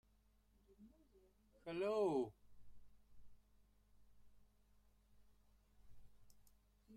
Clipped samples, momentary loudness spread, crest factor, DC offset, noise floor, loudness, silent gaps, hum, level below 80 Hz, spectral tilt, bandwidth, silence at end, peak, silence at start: under 0.1%; 12 LU; 22 dB; under 0.1%; -75 dBFS; -42 LUFS; none; none; -74 dBFS; -6.5 dB/octave; 14.5 kHz; 0 s; -28 dBFS; 0.7 s